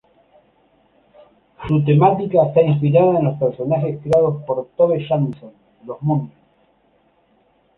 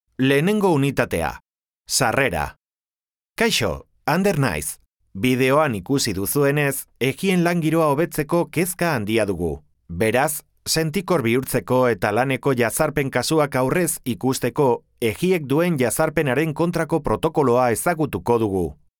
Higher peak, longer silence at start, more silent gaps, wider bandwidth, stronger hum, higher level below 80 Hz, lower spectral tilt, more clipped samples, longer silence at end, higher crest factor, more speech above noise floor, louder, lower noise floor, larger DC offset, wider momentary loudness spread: about the same, -2 dBFS vs -4 dBFS; first, 1.6 s vs 0.2 s; neither; second, 4.2 kHz vs 19.5 kHz; neither; second, -52 dBFS vs -46 dBFS; first, -10 dB/octave vs -5 dB/octave; neither; first, 1.5 s vs 0.25 s; about the same, 16 dB vs 16 dB; second, 43 dB vs over 70 dB; first, -17 LUFS vs -21 LUFS; second, -59 dBFS vs under -90 dBFS; neither; first, 11 LU vs 7 LU